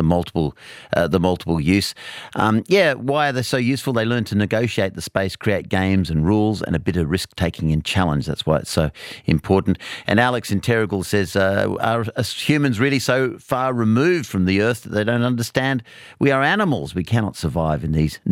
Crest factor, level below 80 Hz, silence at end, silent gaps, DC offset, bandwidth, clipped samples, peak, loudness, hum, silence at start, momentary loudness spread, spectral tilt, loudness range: 18 dB; -42 dBFS; 0 s; none; under 0.1%; 17 kHz; under 0.1%; -2 dBFS; -20 LUFS; none; 0 s; 6 LU; -6 dB/octave; 1 LU